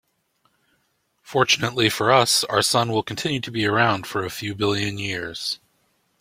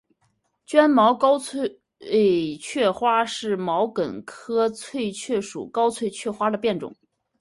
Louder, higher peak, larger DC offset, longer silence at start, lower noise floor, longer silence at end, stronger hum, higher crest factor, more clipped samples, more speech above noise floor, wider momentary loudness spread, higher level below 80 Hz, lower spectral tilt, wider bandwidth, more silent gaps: about the same, -21 LUFS vs -23 LUFS; about the same, -2 dBFS vs -4 dBFS; neither; first, 1.25 s vs 0.7 s; about the same, -69 dBFS vs -69 dBFS; first, 0.65 s vs 0.45 s; neither; about the same, 22 dB vs 20 dB; neither; about the same, 47 dB vs 47 dB; about the same, 10 LU vs 12 LU; first, -58 dBFS vs -66 dBFS; about the same, -3.5 dB/octave vs -4.5 dB/octave; first, 16.5 kHz vs 11.5 kHz; neither